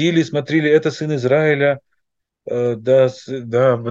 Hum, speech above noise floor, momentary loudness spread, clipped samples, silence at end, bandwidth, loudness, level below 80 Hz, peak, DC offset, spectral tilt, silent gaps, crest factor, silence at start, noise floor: none; 58 dB; 7 LU; under 0.1%; 0 s; 7.8 kHz; -17 LUFS; -66 dBFS; -2 dBFS; under 0.1%; -6.5 dB/octave; none; 14 dB; 0 s; -75 dBFS